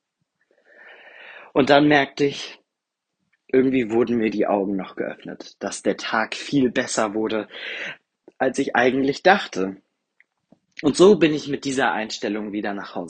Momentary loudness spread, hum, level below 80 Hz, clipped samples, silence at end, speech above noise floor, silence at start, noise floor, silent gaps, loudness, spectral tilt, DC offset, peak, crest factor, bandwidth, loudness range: 15 LU; none; -60 dBFS; under 0.1%; 0 s; 61 dB; 0.85 s; -82 dBFS; none; -21 LUFS; -4.5 dB/octave; under 0.1%; 0 dBFS; 22 dB; 9.6 kHz; 4 LU